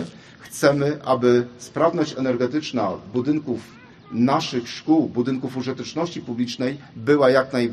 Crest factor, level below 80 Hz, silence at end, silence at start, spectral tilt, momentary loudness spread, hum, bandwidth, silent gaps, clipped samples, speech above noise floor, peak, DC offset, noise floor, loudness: 20 dB; -62 dBFS; 0 s; 0 s; -6 dB/octave; 10 LU; none; 13 kHz; none; under 0.1%; 20 dB; -2 dBFS; under 0.1%; -41 dBFS; -22 LUFS